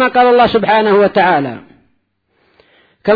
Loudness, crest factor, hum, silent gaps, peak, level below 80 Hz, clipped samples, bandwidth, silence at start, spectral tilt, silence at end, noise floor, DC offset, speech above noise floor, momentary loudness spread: -11 LUFS; 12 dB; none; none; 0 dBFS; -50 dBFS; under 0.1%; 5 kHz; 0 s; -8 dB/octave; 0 s; -62 dBFS; under 0.1%; 51 dB; 14 LU